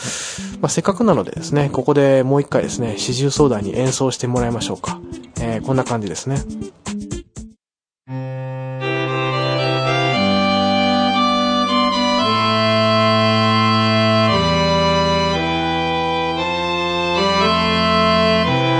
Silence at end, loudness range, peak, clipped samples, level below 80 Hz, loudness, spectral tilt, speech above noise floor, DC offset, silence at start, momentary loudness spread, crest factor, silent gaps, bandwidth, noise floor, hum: 0 s; 10 LU; 0 dBFS; under 0.1%; -42 dBFS; -17 LUFS; -5 dB/octave; over 72 dB; under 0.1%; 0 s; 12 LU; 18 dB; none; 10.5 kHz; under -90 dBFS; none